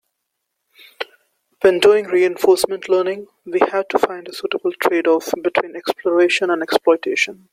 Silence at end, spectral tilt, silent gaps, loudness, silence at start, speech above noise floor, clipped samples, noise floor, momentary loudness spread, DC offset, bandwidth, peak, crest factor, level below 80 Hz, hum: 0.2 s; -3.5 dB/octave; none; -17 LUFS; 1 s; 59 dB; under 0.1%; -76 dBFS; 11 LU; under 0.1%; 16 kHz; 0 dBFS; 18 dB; -64 dBFS; none